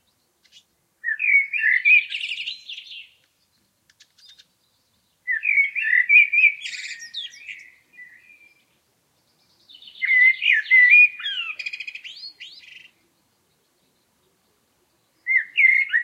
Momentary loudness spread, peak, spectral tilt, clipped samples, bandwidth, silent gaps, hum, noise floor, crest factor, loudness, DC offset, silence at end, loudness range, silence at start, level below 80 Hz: 24 LU; -4 dBFS; 3.5 dB/octave; under 0.1%; 11.5 kHz; none; none; -67 dBFS; 20 dB; -16 LUFS; under 0.1%; 0 s; 17 LU; 1.05 s; -84 dBFS